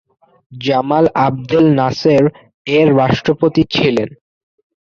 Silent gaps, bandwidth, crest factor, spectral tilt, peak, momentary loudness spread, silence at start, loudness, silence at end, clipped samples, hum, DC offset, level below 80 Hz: 2.54-2.65 s; 7.2 kHz; 12 dB; -7 dB/octave; -2 dBFS; 7 LU; 0.5 s; -14 LUFS; 0.75 s; under 0.1%; none; under 0.1%; -46 dBFS